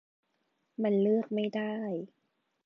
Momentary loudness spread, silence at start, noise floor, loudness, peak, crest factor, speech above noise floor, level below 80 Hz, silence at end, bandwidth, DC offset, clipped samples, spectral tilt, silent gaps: 15 LU; 0.8 s; -78 dBFS; -31 LUFS; -18 dBFS; 16 dB; 48 dB; -88 dBFS; 0.6 s; 5.8 kHz; under 0.1%; under 0.1%; -9 dB/octave; none